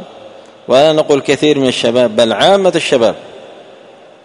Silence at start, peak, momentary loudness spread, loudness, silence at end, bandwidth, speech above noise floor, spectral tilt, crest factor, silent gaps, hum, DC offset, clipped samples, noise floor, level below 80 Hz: 0 s; 0 dBFS; 4 LU; -11 LUFS; 0.7 s; 11 kHz; 28 dB; -4.5 dB/octave; 12 dB; none; none; under 0.1%; 0.2%; -39 dBFS; -54 dBFS